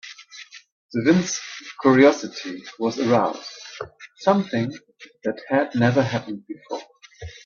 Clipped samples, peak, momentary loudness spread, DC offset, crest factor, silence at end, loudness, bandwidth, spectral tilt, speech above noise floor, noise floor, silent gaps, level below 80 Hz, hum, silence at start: under 0.1%; -2 dBFS; 21 LU; under 0.1%; 20 dB; 0.15 s; -21 LUFS; 7.4 kHz; -5.5 dB/octave; 22 dB; -44 dBFS; 0.72-0.89 s; -60 dBFS; none; 0.05 s